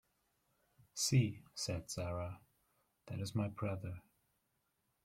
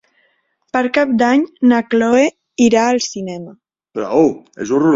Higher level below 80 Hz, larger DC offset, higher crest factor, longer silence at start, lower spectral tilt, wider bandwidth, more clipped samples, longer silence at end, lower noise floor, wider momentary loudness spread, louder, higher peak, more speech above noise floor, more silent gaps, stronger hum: second, -68 dBFS vs -56 dBFS; neither; first, 20 dB vs 14 dB; first, 0.95 s vs 0.75 s; about the same, -4.5 dB/octave vs -4.5 dB/octave; first, 15.5 kHz vs 7.8 kHz; neither; first, 1.05 s vs 0 s; first, -83 dBFS vs -62 dBFS; first, 16 LU vs 13 LU; second, -40 LUFS vs -15 LUFS; second, -20 dBFS vs -2 dBFS; second, 44 dB vs 48 dB; neither; neither